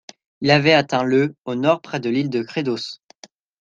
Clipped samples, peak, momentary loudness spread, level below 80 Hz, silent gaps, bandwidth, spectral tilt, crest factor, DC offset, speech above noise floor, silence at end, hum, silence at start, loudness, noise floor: under 0.1%; -2 dBFS; 11 LU; -62 dBFS; 1.38-1.45 s; 9 kHz; -6 dB/octave; 18 dB; under 0.1%; 30 dB; 0.65 s; none; 0.4 s; -19 LUFS; -49 dBFS